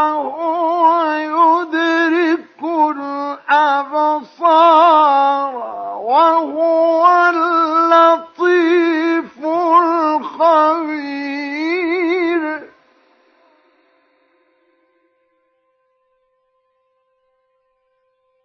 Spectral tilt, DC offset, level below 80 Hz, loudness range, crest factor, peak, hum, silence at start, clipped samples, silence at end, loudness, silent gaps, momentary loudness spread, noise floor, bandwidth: -4 dB/octave; under 0.1%; -72 dBFS; 9 LU; 14 dB; 0 dBFS; none; 0 s; under 0.1%; 5.8 s; -14 LUFS; none; 12 LU; -65 dBFS; 6.6 kHz